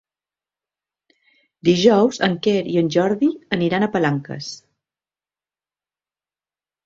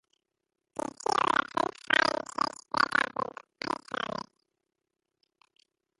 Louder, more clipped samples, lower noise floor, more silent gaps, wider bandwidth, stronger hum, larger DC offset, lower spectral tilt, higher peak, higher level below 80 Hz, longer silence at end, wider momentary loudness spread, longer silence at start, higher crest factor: first, -18 LUFS vs -30 LUFS; neither; first, under -90 dBFS vs -86 dBFS; neither; second, 7.8 kHz vs 11.5 kHz; first, 50 Hz at -45 dBFS vs none; neither; first, -6 dB/octave vs -2.5 dB/octave; first, -2 dBFS vs -8 dBFS; first, -60 dBFS vs -70 dBFS; first, 2.3 s vs 1.8 s; about the same, 15 LU vs 14 LU; first, 1.65 s vs 0.75 s; second, 20 dB vs 26 dB